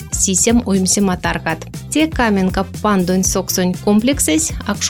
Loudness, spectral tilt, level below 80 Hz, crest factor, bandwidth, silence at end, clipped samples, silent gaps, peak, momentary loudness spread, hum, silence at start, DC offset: -15 LUFS; -4 dB/octave; -32 dBFS; 12 dB; 18 kHz; 0 s; under 0.1%; none; -2 dBFS; 6 LU; none; 0 s; under 0.1%